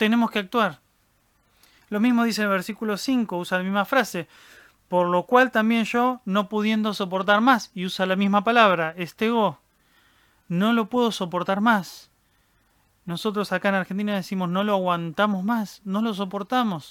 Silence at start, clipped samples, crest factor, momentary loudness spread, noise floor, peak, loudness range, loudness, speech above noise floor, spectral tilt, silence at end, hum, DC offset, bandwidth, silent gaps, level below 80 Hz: 0 s; under 0.1%; 20 dB; 9 LU; -65 dBFS; -4 dBFS; 4 LU; -23 LUFS; 42 dB; -5.5 dB/octave; 0 s; none; under 0.1%; 17 kHz; none; -68 dBFS